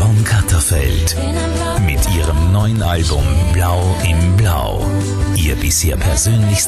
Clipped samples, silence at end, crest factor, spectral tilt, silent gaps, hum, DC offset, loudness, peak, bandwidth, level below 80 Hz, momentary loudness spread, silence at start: under 0.1%; 0 s; 12 dB; -4.5 dB/octave; none; none; under 0.1%; -15 LUFS; -2 dBFS; 13 kHz; -20 dBFS; 4 LU; 0 s